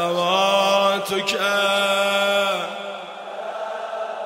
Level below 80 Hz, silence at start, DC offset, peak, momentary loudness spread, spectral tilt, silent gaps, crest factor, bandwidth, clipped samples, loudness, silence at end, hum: -72 dBFS; 0 s; under 0.1%; -6 dBFS; 14 LU; -2.5 dB/octave; none; 16 dB; 16 kHz; under 0.1%; -20 LUFS; 0 s; none